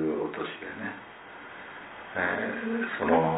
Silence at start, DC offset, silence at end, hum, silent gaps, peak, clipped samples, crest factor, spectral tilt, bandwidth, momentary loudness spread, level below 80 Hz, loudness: 0 s; under 0.1%; 0 s; none; none; -12 dBFS; under 0.1%; 20 dB; -10 dB/octave; 4 kHz; 17 LU; -64 dBFS; -31 LUFS